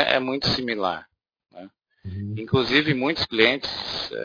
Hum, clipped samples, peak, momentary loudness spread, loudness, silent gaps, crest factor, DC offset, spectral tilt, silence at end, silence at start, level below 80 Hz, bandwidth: none; under 0.1%; -2 dBFS; 15 LU; -22 LUFS; none; 24 dB; under 0.1%; -5.5 dB/octave; 0 s; 0 s; -52 dBFS; 5.4 kHz